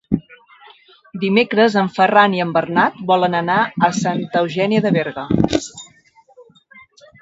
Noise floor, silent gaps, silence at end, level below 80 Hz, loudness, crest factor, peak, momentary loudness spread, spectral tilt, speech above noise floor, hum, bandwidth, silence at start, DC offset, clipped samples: -52 dBFS; none; 0.8 s; -46 dBFS; -17 LUFS; 18 dB; 0 dBFS; 10 LU; -5.5 dB/octave; 36 dB; none; 8 kHz; 0.1 s; under 0.1%; under 0.1%